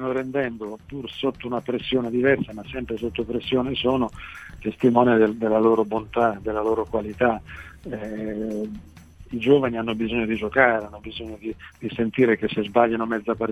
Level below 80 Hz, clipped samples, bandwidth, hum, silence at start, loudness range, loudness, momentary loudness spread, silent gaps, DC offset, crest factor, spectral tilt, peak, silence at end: -48 dBFS; under 0.1%; 11 kHz; none; 0 s; 4 LU; -23 LUFS; 16 LU; none; under 0.1%; 22 dB; -7 dB/octave; -2 dBFS; 0 s